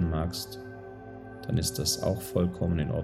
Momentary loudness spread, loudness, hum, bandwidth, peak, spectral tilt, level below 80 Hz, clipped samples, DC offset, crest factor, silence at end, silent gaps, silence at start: 17 LU; -30 LUFS; none; 17 kHz; -12 dBFS; -5 dB/octave; -46 dBFS; under 0.1%; under 0.1%; 18 dB; 0 s; none; 0 s